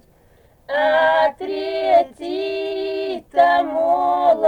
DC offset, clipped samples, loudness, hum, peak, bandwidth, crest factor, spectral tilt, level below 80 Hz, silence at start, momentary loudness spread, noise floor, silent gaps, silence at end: under 0.1%; under 0.1%; -19 LUFS; none; -4 dBFS; 8.8 kHz; 16 dB; -4.5 dB/octave; -56 dBFS; 0.7 s; 10 LU; -53 dBFS; none; 0 s